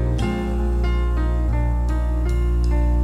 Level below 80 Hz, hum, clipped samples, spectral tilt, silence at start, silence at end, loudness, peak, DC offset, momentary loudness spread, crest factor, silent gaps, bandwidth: -20 dBFS; 60 Hz at -20 dBFS; under 0.1%; -8 dB/octave; 0 s; 0 s; -22 LUFS; -10 dBFS; under 0.1%; 2 LU; 8 dB; none; 8.2 kHz